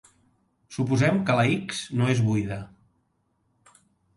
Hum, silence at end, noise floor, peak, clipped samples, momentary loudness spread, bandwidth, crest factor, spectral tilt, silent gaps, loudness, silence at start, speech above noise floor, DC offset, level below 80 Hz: none; 1.5 s; -71 dBFS; -10 dBFS; under 0.1%; 14 LU; 11.5 kHz; 18 dB; -6.5 dB/octave; none; -24 LUFS; 0.7 s; 48 dB; under 0.1%; -58 dBFS